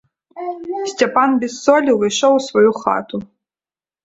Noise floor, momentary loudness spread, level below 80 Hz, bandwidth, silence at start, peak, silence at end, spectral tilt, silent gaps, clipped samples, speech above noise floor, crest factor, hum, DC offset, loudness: under -90 dBFS; 14 LU; -60 dBFS; 8 kHz; 0.35 s; 0 dBFS; 0.8 s; -4 dB/octave; none; under 0.1%; over 74 dB; 16 dB; none; under 0.1%; -16 LUFS